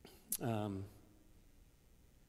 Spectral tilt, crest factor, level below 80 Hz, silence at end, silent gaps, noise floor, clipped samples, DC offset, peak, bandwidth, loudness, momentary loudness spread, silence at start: -5 dB/octave; 26 dB; -68 dBFS; 0.05 s; none; -66 dBFS; under 0.1%; under 0.1%; -20 dBFS; 16 kHz; -42 LUFS; 17 LU; 0.05 s